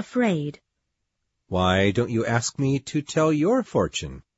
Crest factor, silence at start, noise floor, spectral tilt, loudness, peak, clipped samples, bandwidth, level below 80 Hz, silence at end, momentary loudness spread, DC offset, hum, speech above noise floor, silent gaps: 18 dB; 0 s; -79 dBFS; -5.5 dB/octave; -23 LUFS; -6 dBFS; under 0.1%; 8 kHz; -50 dBFS; 0.2 s; 8 LU; under 0.1%; none; 55 dB; none